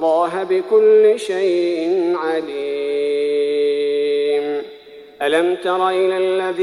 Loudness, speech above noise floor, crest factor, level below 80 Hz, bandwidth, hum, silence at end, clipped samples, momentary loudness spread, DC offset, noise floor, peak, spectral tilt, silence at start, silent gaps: -18 LUFS; 24 dB; 14 dB; -66 dBFS; 11.5 kHz; none; 0 s; under 0.1%; 9 LU; under 0.1%; -40 dBFS; -4 dBFS; -4.5 dB/octave; 0 s; none